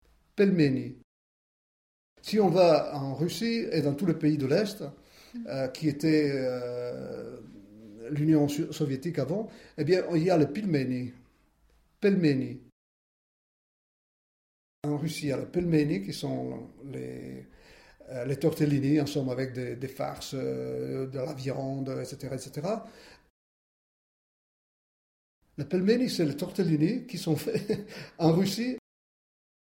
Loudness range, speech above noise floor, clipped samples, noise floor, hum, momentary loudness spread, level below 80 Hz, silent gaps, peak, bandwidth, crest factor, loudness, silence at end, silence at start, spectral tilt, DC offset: 8 LU; 37 dB; under 0.1%; -65 dBFS; none; 16 LU; -62 dBFS; 1.04-2.16 s, 12.72-14.82 s, 23.30-25.42 s; -10 dBFS; 16.5 kHz; 20 dB; -29 LUFS; 1 s; 0.35 s; -7 dB/octave; under 0.1%